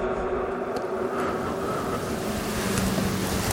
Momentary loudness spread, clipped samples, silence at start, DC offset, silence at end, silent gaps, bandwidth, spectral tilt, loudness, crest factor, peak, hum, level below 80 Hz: 4 LU; under 0.1%; 0 s; under 0.1%; 0 s; none; 17 kHz; -5 dB/octave; -27 LUFS; 20 dB; -6 dBFS; none; -42 dBFS